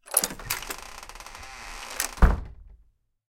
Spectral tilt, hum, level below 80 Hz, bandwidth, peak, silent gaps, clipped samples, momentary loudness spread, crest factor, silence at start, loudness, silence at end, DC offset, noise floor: -3 dB/octave; none; -30 dBFS; 17 kHz; -4 dBFS; none; under 0.1%; 18 LU; 24 dB; 0.05 s; -28 LUFS; 0.55 s; under 0.1%; -62 dBFS